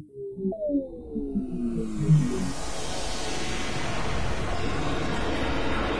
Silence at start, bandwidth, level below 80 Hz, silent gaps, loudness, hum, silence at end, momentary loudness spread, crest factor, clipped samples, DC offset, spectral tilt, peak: 0 s; 11 kHz; -38 dBFS; none; -29 LUFS; none; 0 s; 9 LU; 16 dB; under 0.1%; 3%; -5.5 dB/octave; -10 dBFS